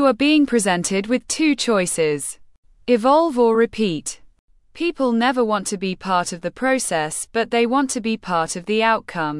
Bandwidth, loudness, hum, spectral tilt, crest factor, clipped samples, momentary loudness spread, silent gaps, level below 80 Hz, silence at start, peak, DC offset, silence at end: 12 kHz; -19 LUFS; none; -4 dB/octave; 16 dB; under 0.1%; 9 LU; 2.58-2.63 s, 4.39-4.48 s; -54 dBFS; 0 s; -4 dBFS; under 0.1%; 0 s